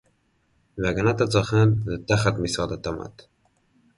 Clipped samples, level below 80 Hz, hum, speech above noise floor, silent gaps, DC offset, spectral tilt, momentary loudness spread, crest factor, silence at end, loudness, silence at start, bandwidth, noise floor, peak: under 0.1%; -46 dBFS; none; 44 dB; none; under 0.1%; -6 dB/octave; 13 LU; 18 dB; 0.9 s; -23 LUFS; 0.75 s; 11.5 kHz; -67 dBFS; -6 dBFS